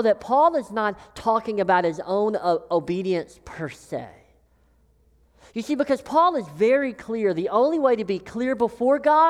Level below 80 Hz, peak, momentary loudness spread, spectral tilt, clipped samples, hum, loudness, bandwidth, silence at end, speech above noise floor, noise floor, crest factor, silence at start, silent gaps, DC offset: -58 dBFS; -6 dBFS; 15 LU; -6 dB/octave; under 0.1%; none; -23 LUFS; 12.5 kHz; 0 s; 38 dB; -60 dBFS; 16 dB; 0 s; none; under 0.1%